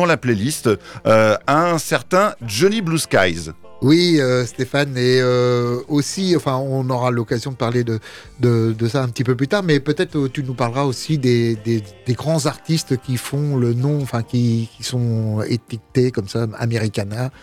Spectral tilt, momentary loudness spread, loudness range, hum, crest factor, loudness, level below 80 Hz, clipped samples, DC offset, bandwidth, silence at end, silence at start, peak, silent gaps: -6 dB/octave; 8 LU; 4 LU; none; 14 dB; -19 LUFS; -50 dBFS; under 0.1%; under 0.1%; 15.5 kHz; 0.15 s; 0 s; -4 dBFS; none